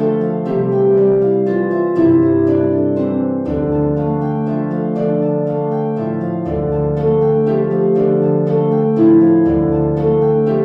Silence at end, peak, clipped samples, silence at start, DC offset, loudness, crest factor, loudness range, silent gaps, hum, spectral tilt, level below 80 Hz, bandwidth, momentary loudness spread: 0 s; -2 dBFS; under 0.1%; 0 s; under 0.1%; -15 LUFS; 12 dB; 4 LU; none; none; -11.5 dB/octave; -38 dBFS; 4.1 kHz; 7 LU